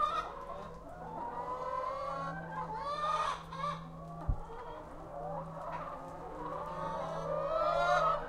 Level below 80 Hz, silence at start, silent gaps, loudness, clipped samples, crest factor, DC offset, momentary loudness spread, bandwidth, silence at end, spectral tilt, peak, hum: -50 dBFS; 0 s; none; -38 LUFS; under 0.1%; 20 dB; under 0.1%; 14 LU; 15 kHz; 0 s; -5.5 dB/octave; -18 dBFS; none